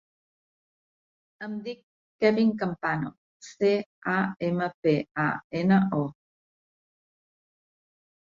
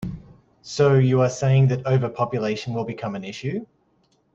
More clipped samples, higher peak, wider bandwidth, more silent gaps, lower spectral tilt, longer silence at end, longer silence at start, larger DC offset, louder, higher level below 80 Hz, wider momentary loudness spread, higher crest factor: neither; second, -10 dBFS vs -6 dBFS; about the same, 7.6 kHz vs 7.6 kHz; first, 1.83-2.19 s, 3.18-3.40 s, 3.86-4.02 s, 4.74-4.83 s, 5.11-5.15 s, 5.44-5.50 s vs none; about the same, -7.5 dB/octave vs -7 dB/octave; first, 2.15 s vs 0.7 s; first, 1.4 s vs 0 s; neither; second, -27 LUFS vs -22 LUFS; second, -68 dBFS vs -54 dBFS; about the same, 15 LU vs 14 LU; about the same, 20 dB vs 16 dB